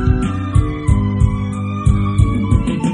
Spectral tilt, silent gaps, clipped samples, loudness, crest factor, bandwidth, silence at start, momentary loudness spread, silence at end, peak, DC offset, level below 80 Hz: -8 dB/octave; none; under 0.1%; -17 LUFS; 14 dB; 10.5 kHz; 0 s; 3 LU; 0 s; 0 dBFS; under 0.1%; -20 dBFS